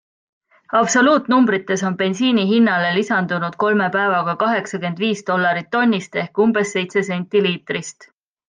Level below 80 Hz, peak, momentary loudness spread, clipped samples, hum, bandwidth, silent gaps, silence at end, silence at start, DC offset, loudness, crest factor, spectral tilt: -68 dBFS; -4 dBFS; 7 LU; under 0.1%; none; 9.6 kHz; none; 0.45 s; 0.7 s; under 0.1%; -18 LUFS; 14 dB; -4.5 dB/octave